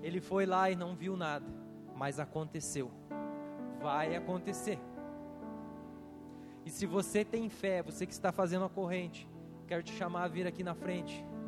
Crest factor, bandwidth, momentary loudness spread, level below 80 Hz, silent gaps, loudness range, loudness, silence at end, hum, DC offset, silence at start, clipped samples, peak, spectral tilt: 20 dB; 15 kHz; 15 LU; -68 dBFS; none; 4 LU; -38 LUFS; 0 s; none; under 0.1%; 0 s; under 0.1%; -18 dBFS; -5.5 dB/octave